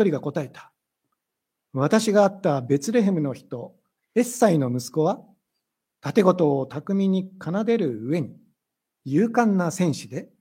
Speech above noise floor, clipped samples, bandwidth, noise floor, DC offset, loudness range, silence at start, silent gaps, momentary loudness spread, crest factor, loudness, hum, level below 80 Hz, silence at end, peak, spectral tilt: 61 dB; under 0.1%; 16 kHz; -83 dBFS; under 0.1%; 2 LU; 0 s; none; 15 LU; 20 dB; -23 LUFS; none; -72 dBFS; 0.15 s; -4 dBFS; -6.5 dB/octave